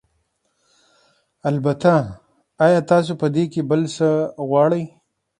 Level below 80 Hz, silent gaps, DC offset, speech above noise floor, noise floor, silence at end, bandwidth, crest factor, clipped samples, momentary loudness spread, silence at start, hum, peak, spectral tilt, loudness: -58 dBFS; none; under 0.1%; 51 dB; -68 dBFS; 0.5 s; 10.5 kHz; 18 dB; under 0.1%; 8 LU; 1.45 s; none; -2 dBFS; -7.5 dB/octave; -19 LUFS